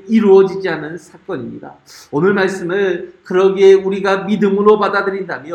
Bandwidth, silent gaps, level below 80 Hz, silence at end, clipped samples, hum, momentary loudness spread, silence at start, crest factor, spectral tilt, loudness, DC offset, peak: 9 kHz; none; -58 dBFS; 0 s; under 0.1%; none; 16 LU; 0.05 s; 14 dB; -6.5 dB/octave; -14 LUFS; under 0.1%; 0 dBFS